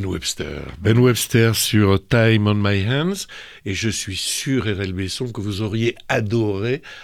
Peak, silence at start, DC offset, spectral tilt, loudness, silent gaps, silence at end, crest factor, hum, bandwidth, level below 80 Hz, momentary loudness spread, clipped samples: -4 dBFS; 0 s; under 0.1%; -5 dB/octave; -20 LUFS; none; 0 s; 16 dB; none; 18.5 kHz; -44 dBFS; 10 LU; under 0.1%